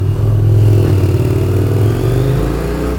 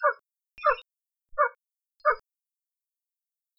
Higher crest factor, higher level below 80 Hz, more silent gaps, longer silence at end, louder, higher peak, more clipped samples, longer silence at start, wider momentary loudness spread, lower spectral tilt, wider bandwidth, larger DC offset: second, 12 dB vs 22 dB; first, -24 dBFS vs -62 dBFS; neither; second, 0 s vs 1.4 s; first, -13 LUFS vs -28 LUFS; first, 0 dBFS vs -10 dBFS; neither; about the same, 0 s vs 0 s; second, 5 LU vs 9 LU; first, -8 dB/octave vs -3.5 dB/octave; first, 18 kHz vs 5.8 kHz; neither